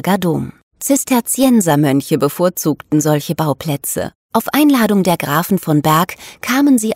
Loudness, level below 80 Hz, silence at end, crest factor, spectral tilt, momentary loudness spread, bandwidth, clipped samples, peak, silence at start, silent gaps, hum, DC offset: -15 LUFS; -52 dBFS; 0 s; 14 dB; -5 dB/octave; 8 LU; 16.5 kHz; under 0.1%; 0 dBFS; 0.05 s; 0.63-0.71 s, 4.15-4.29 s; none; under 0.1%